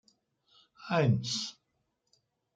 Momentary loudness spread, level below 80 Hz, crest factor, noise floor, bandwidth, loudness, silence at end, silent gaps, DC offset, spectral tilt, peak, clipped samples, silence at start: 14 LU; -72 dBFS; 20 dB; -80 dBFS; 9.2 kHz; -31 LUFS; 1.05 s; none; under 0.1%; -5 dB/octave; -14 dBFS; under 0.1%; 0.8 s